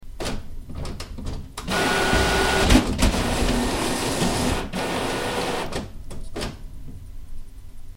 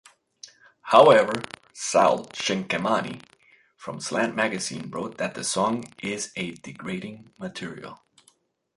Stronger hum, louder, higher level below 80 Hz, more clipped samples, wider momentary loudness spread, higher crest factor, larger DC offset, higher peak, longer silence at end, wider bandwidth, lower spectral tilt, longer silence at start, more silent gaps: neither; about the same, -23 LUFS vs -24 LUFS; first, -30 dBFS vs -66 dBFS; neither; about the same, 22 LU vs 20 LU; about the same, 22 dB vs 24 dB; neither; about the same, -2 dBFS vs -2 dBFS; second, 0.05 s vs 0.85 s; first, 16 kHz vs 11.5 kHz; about the same, -4 dB/octave vs -3.5 dB/octave; second, 0 s vs 0.85 s; neither